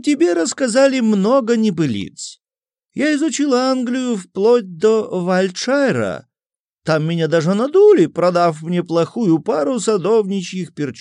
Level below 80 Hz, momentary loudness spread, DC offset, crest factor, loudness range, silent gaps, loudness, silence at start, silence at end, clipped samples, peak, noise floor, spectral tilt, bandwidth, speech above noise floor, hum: -68 dBFS; 10 LU; under 0.1%; 14 dB; 3 LU; 6.60-6.76 s; -16 LUFS; 0.05 s; 0 s; under 0.1%; -2 dBFS; under -90 dBFS; -5.5 dB/octave; 11 kHz; over 74 dB; none